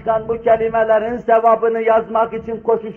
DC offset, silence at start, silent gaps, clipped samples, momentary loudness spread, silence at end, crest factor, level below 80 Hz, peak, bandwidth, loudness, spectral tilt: under 0.1%; 0 s; none; under 0.1%; 6 LU; 0 s; 14 dB; -48 dBFS; -2 dBFS; 3.4 kHz; -16 LUFS; -8 dB/octave